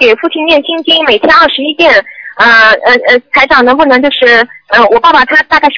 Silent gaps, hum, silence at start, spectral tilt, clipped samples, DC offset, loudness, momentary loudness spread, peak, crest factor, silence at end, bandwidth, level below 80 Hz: none; none; 0 s; -3.5 dB/octave; 6%; 0.3%; -5 LUFS; 5 LU; 0 dBFS; 6 dB; 0 s; 5.4 kHz; -40 dBFS